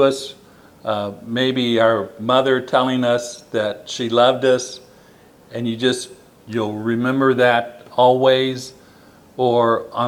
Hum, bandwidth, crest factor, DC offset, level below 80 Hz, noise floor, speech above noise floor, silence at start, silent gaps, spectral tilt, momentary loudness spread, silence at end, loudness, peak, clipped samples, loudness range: none; 18 kHz; 18 dB; under 0.1%; -64 dBFS; -48 dBFS; 30 dB; 0 s; none; -5 dB/octave; 14 LU; 0 s; -18 LUFS; -2 dBFS; under 0.1%; 3 LU